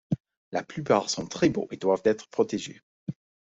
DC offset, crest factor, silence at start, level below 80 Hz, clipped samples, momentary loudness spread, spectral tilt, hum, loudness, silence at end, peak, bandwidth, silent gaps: under 0.1%; 20 dB; 0.1 s; -62 dBFS; under 0.1%; 15 LU; -5 dB/octave; none; -27 LUFS; 0.3 s; -8 dBFS; 8.2 kHz; 0.20-0.24 s, 0.37-0.52 s, 2.83-3.06 s